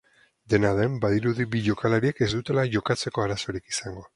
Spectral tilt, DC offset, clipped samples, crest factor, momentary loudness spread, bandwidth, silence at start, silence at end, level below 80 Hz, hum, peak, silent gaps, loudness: -5.5 dB/octave; under 0.1%; under 0.1%; 20 dB; 7 LU; 11.5 kHz; 0.5 s; 0.1 s; -50 dBFS; none; -6 dBFS; none; -25 LUFS